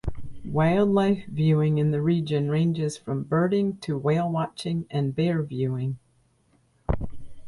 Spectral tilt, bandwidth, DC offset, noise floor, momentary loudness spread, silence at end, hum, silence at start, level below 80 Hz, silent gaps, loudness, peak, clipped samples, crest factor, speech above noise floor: -8 dB/octave; 11.5 kHz; under 0.1%; -64 dBFS; 10 LU; 0 s; none; 0.05 s; -44 dBFS; none; -25 LUFS; -10 dBFS; under 0.1%; 14 dB; 41 dB